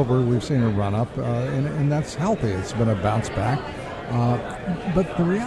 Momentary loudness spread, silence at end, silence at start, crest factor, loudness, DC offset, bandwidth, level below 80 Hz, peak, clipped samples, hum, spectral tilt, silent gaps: 6 LU; 0 s; 0 s; 14 dB; -24 LUFS; under 0.1%; 11 kHz; -42 dBFS; -8 dBFS; under 0.1%; none; -7.5 dB/octave; none